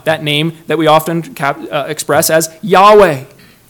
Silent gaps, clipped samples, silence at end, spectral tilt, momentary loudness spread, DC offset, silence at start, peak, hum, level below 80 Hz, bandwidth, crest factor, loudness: none; 2%; 0.45 s; -4 dB/octave; 13 LU; under 0.1%; 0.05 s; 0 dBFS; none; -48 dBFS; 19.5 kHz; 12 dB; -11 LUFS